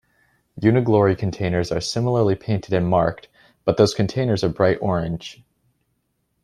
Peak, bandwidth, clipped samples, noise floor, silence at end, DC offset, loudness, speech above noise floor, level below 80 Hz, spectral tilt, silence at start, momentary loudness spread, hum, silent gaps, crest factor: -2 dBFS; 12 kHz; under 0.1%; -71 dBFS; 1.1 s; under 0.1%; -20 LUFS; 51 dB; -48 dBFS; -6.5 dB/octave; 0.55 s; 7 LU; none; none; 18 dB